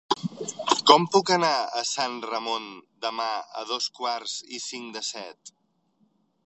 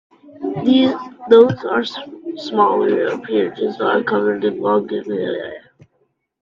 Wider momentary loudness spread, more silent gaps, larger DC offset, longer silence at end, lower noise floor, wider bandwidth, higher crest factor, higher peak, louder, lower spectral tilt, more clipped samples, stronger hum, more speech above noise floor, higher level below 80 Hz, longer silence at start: about the same, 16 LU vs 16 LU; neither; neither; first, 1 s vs 0.85 s; about the same, -68 dBFS vs -65 dBFS; first, 8.4 kHz vs 7.2 kHz; first, 26 dB vs 18 dB; about the same, 0 dBFS vs 0 dBFS; second, -25 LUFS vs -17 LUFS; second, -2.5 dB/octave vs -7 dB/octave; neither; neither; second, 42 dB vs 49 dB; second, -80 dBFS vs -62 dBFS; second, 0.1 s vs 0.25 s